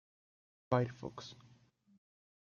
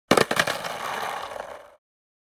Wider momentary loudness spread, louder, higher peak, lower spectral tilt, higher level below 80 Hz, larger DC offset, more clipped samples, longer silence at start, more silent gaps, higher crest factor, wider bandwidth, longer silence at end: about the same, 18 LU vs 19 LU; second, -38 LUFS vs -25 LUFS; second, -16 dBFS vs -2 dBFS; first, -7 dB/octave vs -3 dB/octave; second, -74 dBFS vs -60 dBFS; neither; neither; first, 0.7 s vs 0.1 s; neither; about the same, 26 dB vs 26 dB; second, 7.2 kHz vs 19 kHz; first, 1.05 s vs 0.55 s